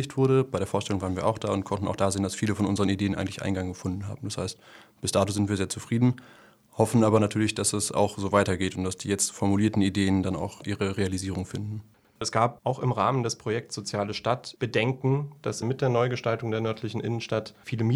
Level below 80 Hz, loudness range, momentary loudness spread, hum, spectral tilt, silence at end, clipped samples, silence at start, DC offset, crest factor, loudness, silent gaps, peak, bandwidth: -58 dBFS; 4 LU; 9 LU; none; -5.5 dB/octave; 0 s; under 0.1%; 0 s; under 0.1%; 20 dB; -27 LUFS; none; -6 dBFS; 15 kHz